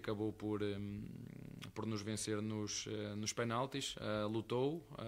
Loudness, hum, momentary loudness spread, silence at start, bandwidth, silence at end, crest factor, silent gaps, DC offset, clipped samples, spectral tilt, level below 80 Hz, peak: -42 LUFS; none; 10 LU; 0 s; 16 kHz; 0 s; 16 dB; none; under 0.1%; under 0.1%; -4.5 dB/octave; -68 dBFS; -26 dBFS